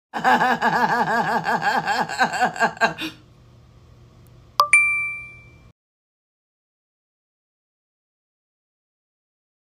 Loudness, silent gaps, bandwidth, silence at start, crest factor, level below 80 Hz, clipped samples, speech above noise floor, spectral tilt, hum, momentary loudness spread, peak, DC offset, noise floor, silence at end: -19 LUFS; none; 15.5 kHz; 0.15 s; 24 dB; -60 dBFS; under 0.1%; 29 dB; -3 dB/octave; none; 12 LU; 0 dBFS; under 0.1%; -50 dBFS; 4.4 s